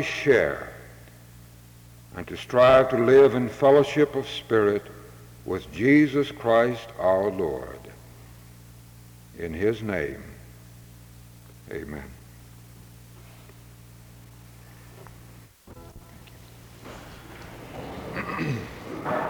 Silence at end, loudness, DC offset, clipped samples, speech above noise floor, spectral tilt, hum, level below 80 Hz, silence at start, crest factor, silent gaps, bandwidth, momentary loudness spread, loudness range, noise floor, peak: 0 s; -23 LUFS; under 0.1%; under 0.1%; 27 dB; -6.5 dB/octave; none; -52 dBFS; 0 s; 20 dB; none; over 20 kHz; 26 LU; 23 LU; -49 dBFS; -6 dBFS